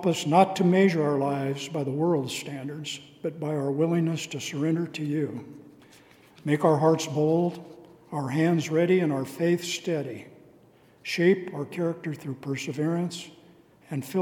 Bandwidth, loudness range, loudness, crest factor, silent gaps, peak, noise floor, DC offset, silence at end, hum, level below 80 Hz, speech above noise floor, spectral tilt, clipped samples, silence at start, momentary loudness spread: 17.5 kHz; 4 LU; -26 LUFS; 22 dB; none; -6 dBFS; -57 dBFS; under 0.1%; 0 s; none; -74 dBFS; 31 dB; -6 dB/octave; under 0.1%; 0 s; 14 LU